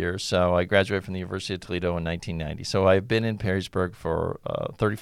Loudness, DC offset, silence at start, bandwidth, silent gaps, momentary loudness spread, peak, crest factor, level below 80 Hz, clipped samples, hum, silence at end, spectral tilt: -26 LUFS; under 0.1%; 0 s; 14.5 kHz; none; 10 LU; -6 dBFS; 18 dB; -46 dBFS; under 0.1%; none; 0 s; -5.5 dB/octave